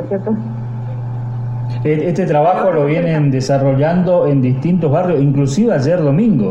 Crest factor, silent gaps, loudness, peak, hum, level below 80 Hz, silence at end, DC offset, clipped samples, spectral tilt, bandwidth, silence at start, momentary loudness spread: 12 dB; none; -15 LUFS; -2 dBFS; none; -42 dBFS; 0 s; under 0.1%; under 0.1%; -8.5 dB/octave; 8.4 kHz; 0 s; 10 LU